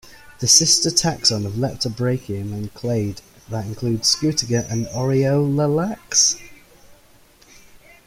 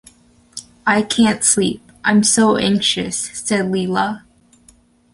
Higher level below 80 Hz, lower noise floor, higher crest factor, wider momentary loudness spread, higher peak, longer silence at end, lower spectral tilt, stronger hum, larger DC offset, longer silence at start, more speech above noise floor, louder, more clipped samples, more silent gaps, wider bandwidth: about the same, -50 dBFS vs -52 dBFS; about the same, -51 dBFS vs -52 dBFS; about the same, 20 dB vs 16 dB; first, 15 LU vs 11 LU; about the same, 0 dBFS vs -2 dBFS; first, 1.15 s vs 0.95 s; about the same, -3.5 dB/octave vs -3 dB/octave; neither; neither; second, 0.05 s vs 0.55 s; second, 31 dB vs 36 dB; second, -19 LUFS vs -16 LUFS; neither; neither; first, 16 kHz vs 11.5 kHz